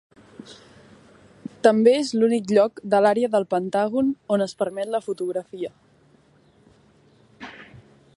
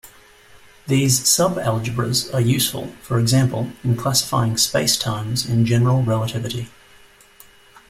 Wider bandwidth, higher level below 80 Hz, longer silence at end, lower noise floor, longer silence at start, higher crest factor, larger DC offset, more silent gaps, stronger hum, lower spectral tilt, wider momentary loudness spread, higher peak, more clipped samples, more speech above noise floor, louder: second, 11.5 kHz vs 16 kHz; second, -68 dBFS vs -48 dBFS; second, 0.5 s vs 1.2 s; first, -57 dBFS vs -49 dBFS; first, 0.45 s vs 0.05 s; about the same, 20 dB vs 18 dB; neither; neither; neither; about the same, -5.5 dB/octave vs -4.5 dB/octave; first, 23 LU vs 9 LU; about the same, -2 dBFS vs -2 dBFS; neither; first, 37 dB vs 30 dB; about the same, -21 LUFS vs -19 LUFS